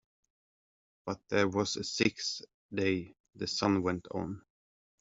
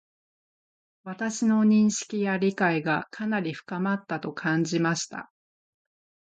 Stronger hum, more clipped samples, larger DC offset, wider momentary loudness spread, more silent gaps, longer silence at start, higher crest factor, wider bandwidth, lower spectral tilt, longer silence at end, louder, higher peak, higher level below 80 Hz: neither; neither; neither; about the same, 12 LU vs 12 LU; first, 2.54-2.69 s, 3.20-3.24 s vs none; about the same, 1.05 s vs 1.05 s; about the same, 22 dB vs 18 dB; second, 7.8 kHz vs 9 kHz; about the same, -4.5 dB/octave vs -5 dB/octave; second, 0.6 s vs 1.15 s; second, -33 LUFS vs -26 LUFS; about the same, -12 dBFS vs -10 dBFS; first, -68 dBFS vs -74 dBFS